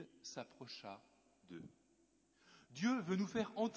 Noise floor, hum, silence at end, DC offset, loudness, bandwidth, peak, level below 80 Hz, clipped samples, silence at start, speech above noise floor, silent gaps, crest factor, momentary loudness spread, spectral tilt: -75 dBFS; none; 0 s; under 0.1%; -42 LUFS; 8 kHz; -26 dBFS; -80 dBFS; under 0.1%; 0 s; 33 dB; none; 18 dB; 18 LU; -5.5 dB/octave